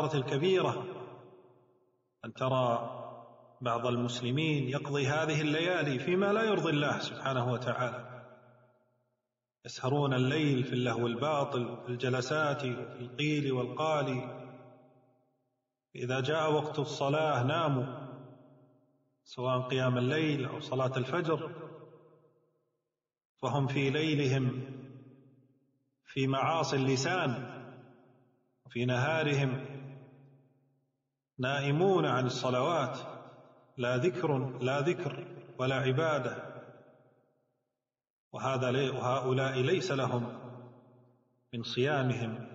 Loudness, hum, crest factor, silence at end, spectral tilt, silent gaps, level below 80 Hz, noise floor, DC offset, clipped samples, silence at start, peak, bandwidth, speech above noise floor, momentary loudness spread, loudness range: -32 LUFS; none; 16 dB; 0 s; -5 dB/octave; 23.25-23.35 s, 38.10-38.31 s; -72 dBFS; -89 dBFS; under 0.1%; under 0.1%; 0 s; -16 dBFS; 7.6 kHz; 58 dB; 17 LU; 4 LU